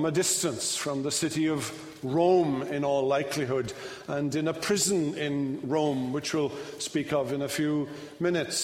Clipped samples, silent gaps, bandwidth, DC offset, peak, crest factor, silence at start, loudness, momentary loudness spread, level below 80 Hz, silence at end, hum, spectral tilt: under 0.1%; none; 16 kHz; under 0.1%; -12 dBFS; 16 dB; 0 s; -28 LUFS; 8 LU; -64 dBFS; 0 s; none; -4 dB/octave